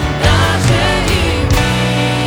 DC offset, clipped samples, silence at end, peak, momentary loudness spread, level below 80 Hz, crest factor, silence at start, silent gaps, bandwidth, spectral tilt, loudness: under 0.1%; under 0.1%; 0 s; 0 dBFS; 2 LU; -22 dBFS; 12 dB; 0 s; none; 18.5 kHz; -5 dB/octave; -13 LUFS